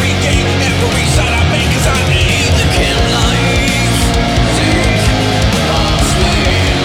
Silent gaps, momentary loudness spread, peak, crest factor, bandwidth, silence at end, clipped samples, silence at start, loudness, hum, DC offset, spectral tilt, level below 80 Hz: none; 1 LU; -2 dBFS; 10 dB; 17.5 kHz; 0 s; under 0.1%; 0 s; -11 LUFS; none; under 0.1%; -4.5 dB/octave; -18 dBFS